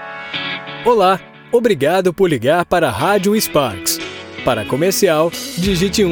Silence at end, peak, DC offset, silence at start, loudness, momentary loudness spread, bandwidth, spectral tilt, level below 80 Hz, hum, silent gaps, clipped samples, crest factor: 0 s; 0 dBFS; under 0.1%; 0 s; -16 LUFS; 8 LU; over 20 kHz; -4.5 dB/octave; -40 dBFS; none; none; under 0.1%; 14 dB